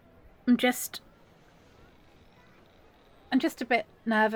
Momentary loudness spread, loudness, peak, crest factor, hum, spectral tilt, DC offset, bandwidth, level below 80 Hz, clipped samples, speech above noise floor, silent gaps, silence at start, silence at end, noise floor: 10 LU; -28 LUFS; -12 dBFS; 20 dB; none; -3.5 dB/octave; under 0.1%; over 20 kHz; -64 dBFS; under 0.1%; 31 dB; none; 0.45 s; 0 s; -58 dBFS